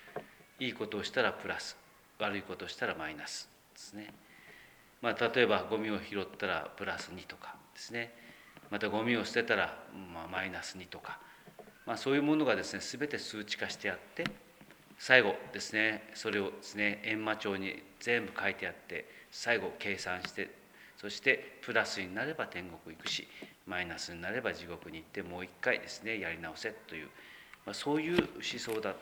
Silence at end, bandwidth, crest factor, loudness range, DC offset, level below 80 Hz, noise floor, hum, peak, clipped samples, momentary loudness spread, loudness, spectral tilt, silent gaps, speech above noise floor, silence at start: 0 s; over 20 kHz; 30 dB; 7 LU; under 0.1%; -70 dBFS; -59 dBFS; none; -8 dBFS; under 0.1%; 18 LU; -35 LUFS; -3.5 dB/octave; none; 23 dB; 0 s